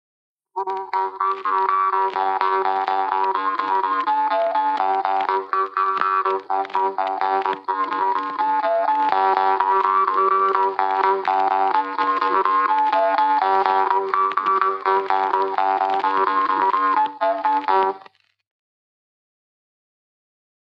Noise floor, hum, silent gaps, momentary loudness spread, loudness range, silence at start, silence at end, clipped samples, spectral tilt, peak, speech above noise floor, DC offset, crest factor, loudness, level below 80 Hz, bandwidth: -50 dBFS; none; none; 5 LU; 3 LU; 0.55 s; 2.75 s; under 0.1%; -4.5 dB/octave; -2 dBFS; 29 dB; under 0.1%; 18 dB; -20 LUFS; under -90 dBFS; 6.2 kHz